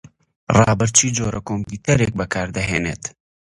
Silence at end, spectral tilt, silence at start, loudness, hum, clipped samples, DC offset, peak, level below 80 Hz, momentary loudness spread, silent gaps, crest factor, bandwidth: 0.5 s; -4 dB/octave; 0.5 s; -19 LUFS; none; under 0.1%; under 0.1%; 0 dBFS; -40 dBFS; 12 LU; none; 20 dB; 11.5 kHz